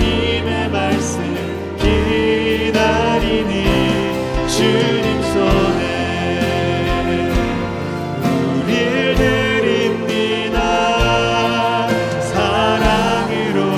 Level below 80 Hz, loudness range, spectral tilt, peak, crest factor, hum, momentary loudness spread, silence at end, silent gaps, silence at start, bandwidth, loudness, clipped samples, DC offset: -28 dBFS; 2 LU; -5.5 dB/octave; 0 dBFS; 16 dB; none; 5 LU; 0 s; none; 0 s; 15.5 kHz; -16 LUFS; under 0.1%; under 0.1%